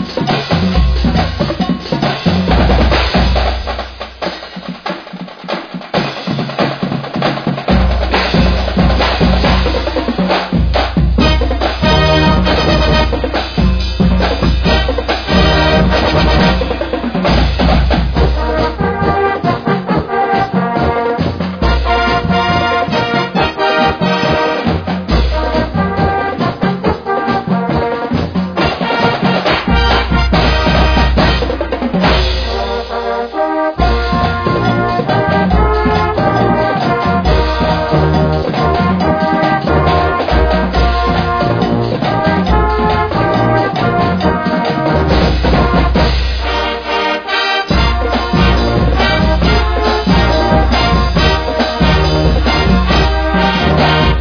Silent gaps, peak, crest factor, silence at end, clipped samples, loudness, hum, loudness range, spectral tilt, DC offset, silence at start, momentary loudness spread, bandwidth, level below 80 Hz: none; 0 dBFS; 12 dB; 0 s; under 0.1%; -13 LUFS; none; 3 LU; -7 dB/octave; under 0.1%; 0 s; 5 LU; 5.4 kHz; -18 dBFS